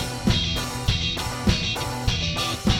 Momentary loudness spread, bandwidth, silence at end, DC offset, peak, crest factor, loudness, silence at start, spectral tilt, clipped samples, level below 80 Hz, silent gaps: 3 LU; 17.5 kHz; 0 s; under 0.1%; -6 dBFS; 18 dB; -24 LUFS; 0 s; -4 dB/octave; under 0.1%; -32 dBFS; none